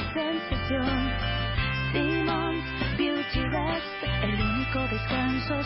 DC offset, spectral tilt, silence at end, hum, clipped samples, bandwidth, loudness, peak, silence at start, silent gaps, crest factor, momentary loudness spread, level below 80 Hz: under 0.1%; -10 dB/octave; 0 s; none; under 0.1%; 5.8 kHz; -28 LUFS; -14 dBFS; 0 s; none; 12 dB; 3 LU; -36 dBFS